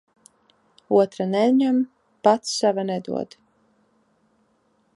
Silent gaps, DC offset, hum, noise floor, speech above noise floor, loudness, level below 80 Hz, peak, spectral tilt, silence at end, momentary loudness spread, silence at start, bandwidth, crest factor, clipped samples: none; under 0.1%; none; -65 dBFS; 45 dB; -22 LUFS; -76 dBFS; -2 dBFS; -5 dB/octave; 1.7 s; 12 LU; 0.9 s; 11.5 kHz; 22 dB; under 0.1%